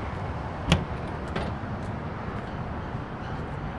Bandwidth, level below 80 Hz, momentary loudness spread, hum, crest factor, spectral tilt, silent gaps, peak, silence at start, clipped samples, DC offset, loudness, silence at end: 11.5 kHz; -40 dBFS; 8 LU; none; 26 dB; -6 dB/octave; none; -6 dBFS; 0 s; under 0.1%; 0.1%; -32 LUFS; 0 s